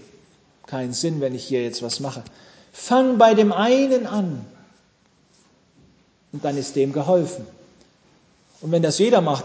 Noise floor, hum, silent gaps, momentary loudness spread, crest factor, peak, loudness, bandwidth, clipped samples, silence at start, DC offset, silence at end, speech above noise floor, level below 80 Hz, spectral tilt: -60 dBFS; none; none; 19 LU; 20 dB; -2 dBFS; -20 LUFS; 8 kHz; under 0.1%; 0.7 s; under 0.1%; 0 s; 40 dB; -66 dBFS; -5.5 dB/octave